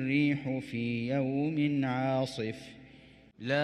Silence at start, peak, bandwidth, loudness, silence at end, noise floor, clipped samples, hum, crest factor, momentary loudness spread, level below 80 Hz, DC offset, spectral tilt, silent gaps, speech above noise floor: 0 s; -18 dBFS; 11 kHz; -31 LUFS; 0 s; -56 dBFS; under 0.1%; none; 14 dB; 10 LU; -66 dBFS; under 0.1%; -7 dB/octave; none; 25 dB